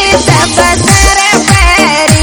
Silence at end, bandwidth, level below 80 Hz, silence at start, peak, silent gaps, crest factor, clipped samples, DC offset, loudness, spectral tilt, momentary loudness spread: 0 s; over 20 kHz; -16 dBFS; 0 s; 0 dBFS; none; 6 dB; 6%; under 0.1%; -6 LUFS; -3.5 dB/octave; 2 LU